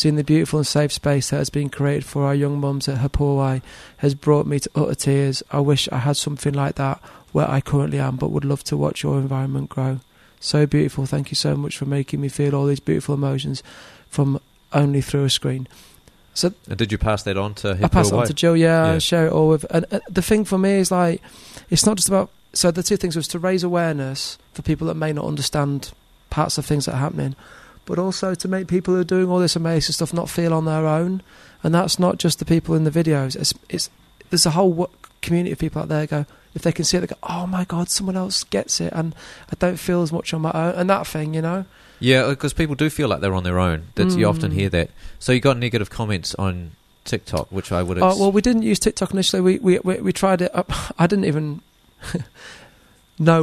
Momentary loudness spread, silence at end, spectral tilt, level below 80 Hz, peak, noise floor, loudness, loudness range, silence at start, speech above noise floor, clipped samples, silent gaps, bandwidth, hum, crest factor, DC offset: 10 LU; 0 s; -5 dB/octave; -40 dBFS; -2 dBFS; -53 dBFS; -20 LUFS; 4 LU; 0 s; 33 dB; under 0.1%; none; 13.5 kHz; none; 18 dB; under 0.1%